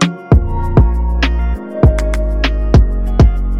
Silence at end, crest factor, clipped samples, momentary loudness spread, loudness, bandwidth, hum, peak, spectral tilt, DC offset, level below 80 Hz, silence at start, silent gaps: 0 s; 10 dB; under 0.1%; 5 LU; -14 LUFS; 9.2 kHz; none; -2 dBFS; -7 dB/octave; 0.7%; -14 dBFS; 0 s; none